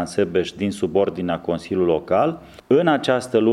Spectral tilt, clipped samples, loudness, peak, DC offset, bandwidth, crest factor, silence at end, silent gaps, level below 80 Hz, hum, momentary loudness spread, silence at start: -6 dB/octave; under 0.1%; -21 LUFS; -4 dBFS; under 0.1%; 12.5 kHz; 16 dB; 0 s; none; -54 dBFS; none; 7 LU; 0 s